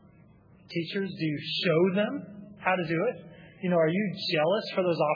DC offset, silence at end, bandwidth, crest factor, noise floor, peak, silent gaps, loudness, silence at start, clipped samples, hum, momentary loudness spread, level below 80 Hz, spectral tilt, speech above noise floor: under 0.1%; 0 s; 5.2 kHz; 20 dB; -56 dBFS; -10 dBFS; none; -28 LUFS; 0.7 s; under 0.1%; none; 11 LU; -70 dBFS; -7.5 dB/octave; 29 dB